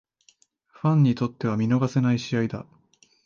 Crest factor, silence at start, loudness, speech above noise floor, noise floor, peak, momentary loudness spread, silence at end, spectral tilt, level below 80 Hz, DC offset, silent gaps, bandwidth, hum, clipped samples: 14 dB; 0.85 s; -24 LUFS; 40 dB; -62 dBFS; -10 dBFS; 7 LU; 0.65 s; -8 dB/octave; -62 dBFS; under 0.1%; none; 7.2 kHz; none; under 0.1%